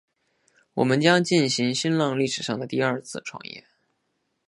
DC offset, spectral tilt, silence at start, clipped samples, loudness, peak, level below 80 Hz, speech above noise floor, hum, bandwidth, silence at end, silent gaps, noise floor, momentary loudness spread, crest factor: under 0.1%; -4.5 dB/octave; 0.75 s; under 0.1%; -23 LUFS; -4 dBFS; -70 dBFS; 51 dB; none; 11.5 kHz; 0.9 s; none; -75 dBFS; 17 LU; 22 dB